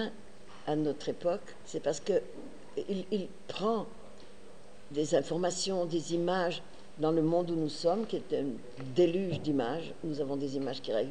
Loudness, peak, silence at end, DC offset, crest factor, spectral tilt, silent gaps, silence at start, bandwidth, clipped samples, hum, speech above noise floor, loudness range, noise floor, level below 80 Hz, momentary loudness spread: -33 LUFS; -16 dBFS; 0 s; 0.7%; 18 dB; -5.5 dB/octave; none; 0 s; 10.5 kHz; under 0.1%; none; 22 dB; 5 LU; -54 dBFS; -64 dBFS; 13 LU